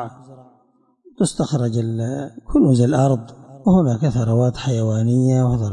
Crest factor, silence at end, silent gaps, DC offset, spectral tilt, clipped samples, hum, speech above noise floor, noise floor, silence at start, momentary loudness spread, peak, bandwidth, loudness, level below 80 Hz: 14 dB; 0 s; none; under 0.1%; -7.5 dB/octave; under 0.1%; none; 42 dB; -59 dBFS; 0 s; 8 LU; -6 dBFS; 11 kHz; -18 LUFS; -42 dBFS